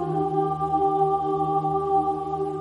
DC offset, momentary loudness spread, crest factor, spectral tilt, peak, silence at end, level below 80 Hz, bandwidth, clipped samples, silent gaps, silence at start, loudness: under 0.1%; 4 LU; 12 dB; -9 dB/octave; -12 dBFS; 0 s; -52 dBFS; 11 kHz; under 0.1%; none; 0 s; -24 LUFS